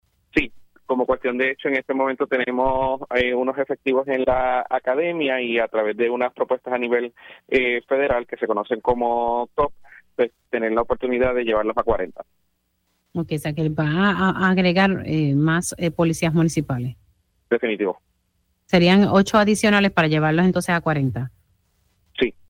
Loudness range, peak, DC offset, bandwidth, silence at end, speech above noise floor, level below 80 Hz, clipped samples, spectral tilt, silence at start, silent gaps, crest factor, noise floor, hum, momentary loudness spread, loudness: 5 LU; -2 dBFS; under 0.1%; 15.5 kHz; 0.15 s; 50 dB; -46 dBFS; under 0.1%; -6 dB/octave; 0.35 s; none; 18 dB; -70 dBFS; none; 9 LU; -21 LUFS